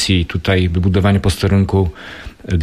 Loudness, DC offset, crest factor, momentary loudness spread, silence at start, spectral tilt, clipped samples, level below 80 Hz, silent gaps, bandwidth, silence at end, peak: -15 LUFS; under 0.1%; 12 dB; 16 LU; 0 s; -6 dB/octave; under 0.1%; -30 dBFS; none; 13 kHz; 0 s; -2 dBFS